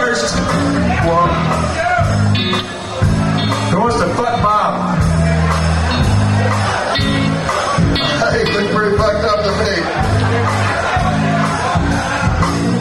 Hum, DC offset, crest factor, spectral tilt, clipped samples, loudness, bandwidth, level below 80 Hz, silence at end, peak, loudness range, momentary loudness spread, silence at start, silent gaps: none; under 0.1%; 12 dB; -5.5 dB/octave; under 0.1%; -15 LUFS; 12 kHz; -26 dBFS; 0 s; -2 dBFS; 1 LU; 2 LU; 0 s; none